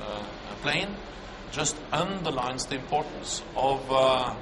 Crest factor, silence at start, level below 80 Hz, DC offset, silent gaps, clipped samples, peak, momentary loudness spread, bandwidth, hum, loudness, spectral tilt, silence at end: 18 dB; 0 s; -48 dBFS; under 0.1%; none; under 0.1%; -10 dBFS; 13 LU; 11.5 kHz; none; -28 LUFS; -3 dB/octave; 0 s